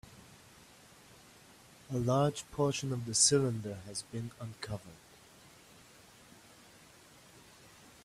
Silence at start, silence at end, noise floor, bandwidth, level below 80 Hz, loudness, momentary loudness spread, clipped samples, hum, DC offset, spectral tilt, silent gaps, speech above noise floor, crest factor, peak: 0.1 s; 0.65 s; -59 dBFS; 15.5 kHz; -66 dBFS; -33 LUFS; 29 LU; under 0.1%; none; under 0.1%; -4 dB/octave; none; 25 dB; 24 dB; -12 dBFS